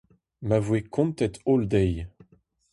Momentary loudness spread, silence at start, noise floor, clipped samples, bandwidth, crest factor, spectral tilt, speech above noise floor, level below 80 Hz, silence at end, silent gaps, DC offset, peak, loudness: 13 LU; 0.4 s; -61 dBFS; under 0.1%; 11.5 kHz; 18 dB; -8 dB/octave; 37 dB; -44 dBFS; 0.65 s; none; under 0.1%; -10 dBFS; -25 LUFS